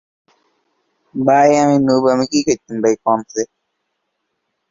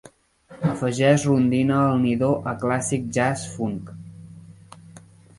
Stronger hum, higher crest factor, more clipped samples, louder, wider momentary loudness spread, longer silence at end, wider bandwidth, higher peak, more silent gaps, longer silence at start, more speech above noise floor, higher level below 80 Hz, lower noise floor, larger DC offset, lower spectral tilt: neither; about the same, 16 dB vs 18 dB; neither; first, -15 LUFS vs -22 LUFS; about the same, 13 LU vs 12 LU; first, 1.25 s vs 0.4 s; second, 7.6 kHz vs 11.5 kHz; about the same, -2 dBFS vs -4 dBFS; neither; first, 1.15 s vs 0.5 s; first, 58 dB vs 29 dB; about the same, -56 dBFS vs -54 dBFS; first, -72 dBFS vs -50 dBFS; neither; about the same, -5 dB/octave vs -6 dB/octave